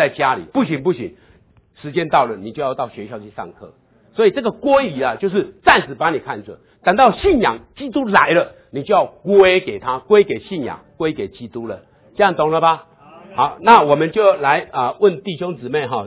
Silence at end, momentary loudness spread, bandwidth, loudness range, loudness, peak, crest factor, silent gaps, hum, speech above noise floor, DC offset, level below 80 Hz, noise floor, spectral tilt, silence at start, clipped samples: 0 s; 16 LU; 4 kHz; 6 LU; -16 LUFS; 0 dBFS; 18 dB; none; none; 35 dB; under 0.1%; -48 dBFS; -52 dBFS; -9.5 dB/octave; 0 s; under 0.1%